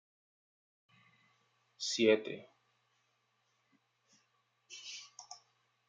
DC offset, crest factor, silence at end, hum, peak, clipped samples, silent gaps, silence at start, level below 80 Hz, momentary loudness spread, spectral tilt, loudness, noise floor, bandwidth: under 0.1%; 26 dB; 0.55 s; none; -14 dBFS; under 0.1%; none; 1.8 s; under -90 dBFS; 24 LU; -3 dB/octave; -34 LUFS; -78 dBFS; 9.4 kHz